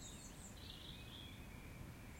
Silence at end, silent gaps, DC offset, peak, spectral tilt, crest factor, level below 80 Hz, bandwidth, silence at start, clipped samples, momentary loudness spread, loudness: 0 s; none; under 0.1%; -40 dBFS; -3.5 dB/octave; 14 dB; -60 dBFS; 16.5 kHz; 0 s; under 0.1%; 2 LU; -54 LUFS